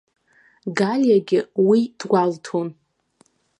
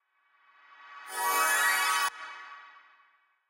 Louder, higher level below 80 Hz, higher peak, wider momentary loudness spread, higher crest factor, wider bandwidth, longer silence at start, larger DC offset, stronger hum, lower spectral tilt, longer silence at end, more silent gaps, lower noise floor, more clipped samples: first, -20 LUFS vs -27 LUFS; first, -74 dBFS vs -84 dBFS; first, -4 dBFS vs -16 dBFS; second, 11 LU vs 23 LU; about the same, 16 dB vs 18 dB; second, 10.5 kHz vs 16 kHz; second, 0.65 s vs 0.8 s; neither; neither; first, -6.5 dB/octave vs 3 dB/octave; about the same, 0.85 s vs 0.8 s; neither; second, -61 dBFS vs -67 dBFS; neither